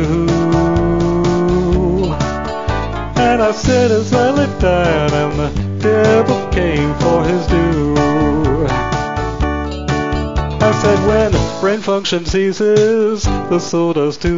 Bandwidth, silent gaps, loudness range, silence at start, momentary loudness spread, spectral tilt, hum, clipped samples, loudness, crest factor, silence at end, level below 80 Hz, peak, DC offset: 7.8 kHz; none; 2 LU; 0 s; 6 LU; -6.5 dB/octave; none; under 0.1%; -15 LUFS; 14 dB; 0 s; -26 dBFS; 0 dBFS; 2%